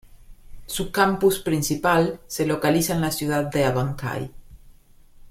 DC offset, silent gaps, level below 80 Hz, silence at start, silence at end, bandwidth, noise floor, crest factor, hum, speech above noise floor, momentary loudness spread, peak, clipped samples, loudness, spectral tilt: under 0.1%; none; -46 dBFS; 0.3 s; 0 s; 16.5 kHz; -50 dBFS; 18 dB; none; 28 dB; 10 LU; -6 dBFS; under 0.1%; -23 LUFS; -5 dB/octave